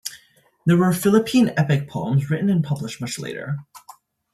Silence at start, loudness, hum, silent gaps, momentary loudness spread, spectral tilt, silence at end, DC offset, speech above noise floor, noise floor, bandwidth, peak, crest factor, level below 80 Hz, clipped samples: 0.05 s; -21 LUFS; none; none; 12 LU; -6.5 dB/octave; 0.55 s; under 0.1%; 37 dB; -56 dBFS; 13.5 kHz; -4 dBFS; 18 dB; -60 dBFS; under 0.1%